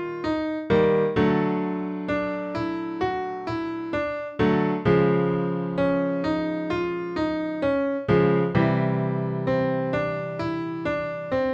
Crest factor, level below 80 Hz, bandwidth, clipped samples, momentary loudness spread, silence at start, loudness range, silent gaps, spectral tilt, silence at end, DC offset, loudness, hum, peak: 16 dB; -50 dBFS; 7.4 kHz; under 0.1%; 8 LU; 0 s; 3 LU; none; -8.5 dB/octave; 0 s; under 0.1%; -25 LUFS; none; -8 dBFS